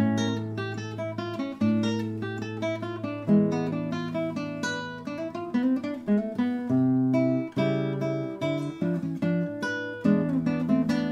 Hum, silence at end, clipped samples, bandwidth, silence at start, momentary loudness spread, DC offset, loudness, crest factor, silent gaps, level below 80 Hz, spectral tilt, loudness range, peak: none; 0 s; under 0.1%; 10.5 kHz; 0 s; 9 LU; under 0.1%; -28 LUFS; 16 dB; none; -64 dBFS; -7 dB/octave; 3 LU; -10 dBFS